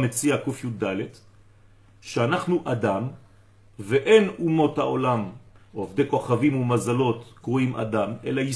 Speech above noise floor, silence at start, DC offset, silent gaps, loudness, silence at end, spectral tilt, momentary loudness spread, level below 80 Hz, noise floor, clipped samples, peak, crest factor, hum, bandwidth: 30 dB; 0 s; under 0.1%; none; -24 LUFS; 0 s; -6 dB/octave; 12 LU; -58 dBFS; -53 dBFS; under 0.1%; -4 dBFS; 20 dB; none; 11 kHz